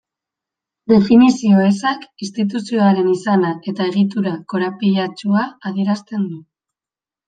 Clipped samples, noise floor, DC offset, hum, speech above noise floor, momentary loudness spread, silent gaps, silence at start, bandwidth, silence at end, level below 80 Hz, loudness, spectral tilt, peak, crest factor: under 0.1%; under -90 dBFS; under 0.1%; none; over 74 dB; 12 LU; none; 0.9 s; 9.2 kHz; 0.9 s; -58 dBFS; -17 LUFS; -7 dB/octave; -2 dBFS; 16 dB